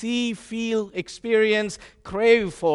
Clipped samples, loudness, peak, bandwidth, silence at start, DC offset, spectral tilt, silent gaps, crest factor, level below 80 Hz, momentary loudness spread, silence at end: under 0.1%; -23 LUFS; -6 dBFS; 11.5 kHz; 0 s; under 0.1%; -4.5 dB/octave; none; 18 dB; -54 dBFS; 13 LU; 0 s